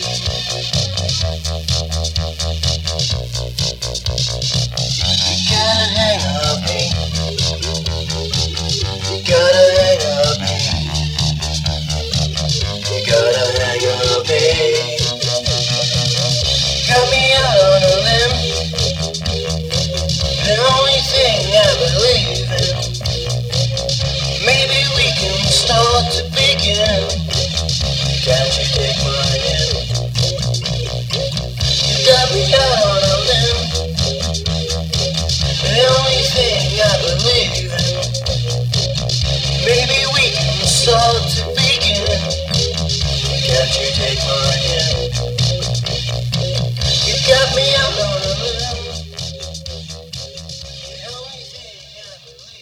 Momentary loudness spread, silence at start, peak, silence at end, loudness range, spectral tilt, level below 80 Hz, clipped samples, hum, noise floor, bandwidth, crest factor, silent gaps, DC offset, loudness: 8 LU; 0 s; 0 dBFS; 0 s; 4 LU; -3.5 dB/octave; -28 dBFS; under 0.1%; none; -39 dBFS; 16 kHz; 16 dB; none; under 0.1%; -15 LUFS